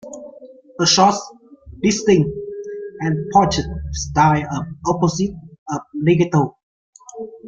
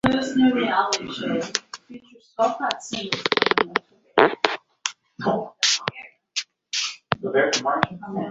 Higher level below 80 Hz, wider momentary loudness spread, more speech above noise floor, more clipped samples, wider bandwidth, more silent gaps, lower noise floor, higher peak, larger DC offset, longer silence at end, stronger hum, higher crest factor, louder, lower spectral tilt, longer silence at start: first, -40 dBFS vs -56 dBFS; first, 20 LU vs 11 LU; about the same, 25 dB vs 22 dB; neither; about the same, 7.8 kHz vs 8 kHz; first, 5.58-5.66 s, 6.63-6.93 s vs none; about the same, -42 dBFS vs -45 dBFS; about the same, -2 dBFS vs 0 dBFS; neither; about the same, 0 s vs 0 s; neither; second, 18 dB vs 24 dB; first, -18 LUFS vs -23 LUFS; first, -5 dB/octave vs -3 dB/octave; about the same, 0.05 s vs 0.05 s